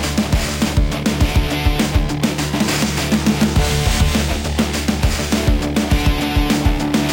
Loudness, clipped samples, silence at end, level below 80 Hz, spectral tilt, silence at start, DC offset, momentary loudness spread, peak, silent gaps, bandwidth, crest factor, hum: -17 LUFS; under 0.1%; 0 s; -22 dBFS; -5 dB/octave; 0 s; under 0.1%; 3 LU; -2 dBFS; none; 17 kHz; 14 dB; none